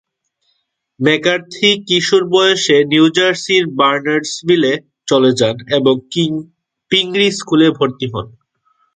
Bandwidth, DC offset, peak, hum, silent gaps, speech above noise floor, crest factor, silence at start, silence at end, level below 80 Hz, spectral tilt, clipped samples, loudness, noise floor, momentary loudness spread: 9.4 kHz; under 0.1%; 0 dBFS; none; none; 53 dB; 14 dB; 1 s; 0.7 s; -56 dBFS; -4 dB/octave; under 0.1%; -13 LUFS; -67 dBFS; 7 LU